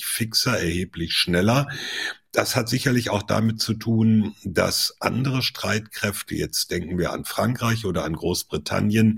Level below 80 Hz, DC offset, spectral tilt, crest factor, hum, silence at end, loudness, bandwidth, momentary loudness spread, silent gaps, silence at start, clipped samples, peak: -48 dBFS; under 0.1%; -4.5 dB/octave; 20 dB; none; 0 s; -23 LUFS; 16.5 kHz; 7 LU; none; 0 s; under 0.1%; -2 dBFS